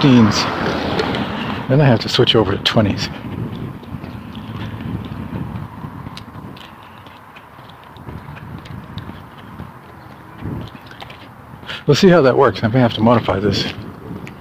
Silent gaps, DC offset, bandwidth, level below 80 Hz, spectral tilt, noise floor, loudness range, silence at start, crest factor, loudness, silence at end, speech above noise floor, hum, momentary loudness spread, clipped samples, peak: none; under 0.1%; 15.5 kHz; -42 dBFS; -6 dB/octave; -39 dBFS; 19 LU; 0 s; 18 dB; -16 LUFS; 0 s; 26 dB; none; 24 LU; under 0.1%; 0 dBFS